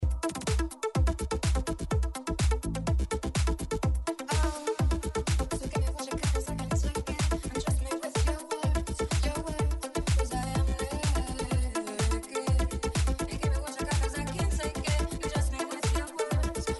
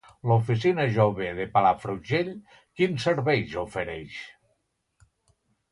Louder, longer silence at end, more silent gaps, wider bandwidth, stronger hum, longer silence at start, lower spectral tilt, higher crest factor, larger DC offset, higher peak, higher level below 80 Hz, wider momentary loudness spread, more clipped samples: second, -31 LUFS vs -25 LUFS; second, 0 s vs 1.4 s; neither; about the same, 11.5 kHz vs 11 kHz; neither; second, 0 s vs 0.25 s; second, -5 dB/octave vs -7 dB/octave; second, 12 dB vs 20 dB; neither; second, -16 dBFS vs -6 dBFS; first, -32 dBFS vs -56 dBFS; second, 3 LU vs 14 LU; neither